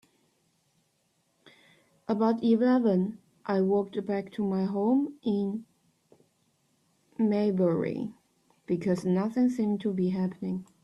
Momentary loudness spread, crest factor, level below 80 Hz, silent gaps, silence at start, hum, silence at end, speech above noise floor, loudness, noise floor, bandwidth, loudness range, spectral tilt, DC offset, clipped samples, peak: 11 LU; 16 dB; -70 dBFS; none; 2.1 s; none; 0.2 s; 46 dB; -28 LUFS; -73 dBFS; 11 kHz; 4 LU; -8.5 dB/octave; under 0.1%; under 0.1%; -14 dBFS